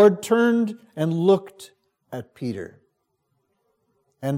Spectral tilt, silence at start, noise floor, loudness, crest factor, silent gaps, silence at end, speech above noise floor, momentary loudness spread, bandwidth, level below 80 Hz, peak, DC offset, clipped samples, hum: -7 dB/octave; 0 s; -73 dBFS; -22 LUFS; 20 dB; none; 0 s; 51 dB; 18 LU; 16 kHz; -74 dBFS; -4 dBFS; under 0.1%; under 0.1%; none